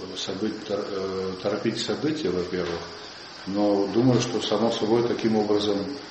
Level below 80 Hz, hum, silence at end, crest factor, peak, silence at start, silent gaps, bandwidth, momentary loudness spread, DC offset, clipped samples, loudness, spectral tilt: -60 dBFS; none; 0 s; 18 dB; -8 dBFS; 0 s; none; 8.4 kHz; 9 LU; under 0.1%; under 0.1%; -25 LUFS; -5.5 dB/octave